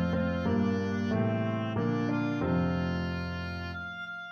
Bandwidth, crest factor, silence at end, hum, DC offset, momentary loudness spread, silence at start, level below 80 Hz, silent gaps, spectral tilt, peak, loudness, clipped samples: 6.6 kHz; 12 dB; 0 s; none; under 0.1%; 8 LU; 0 s; -50 dBFS; none; -8 dB/octave; -18 dBFS; -31 LUFS; under 0.1%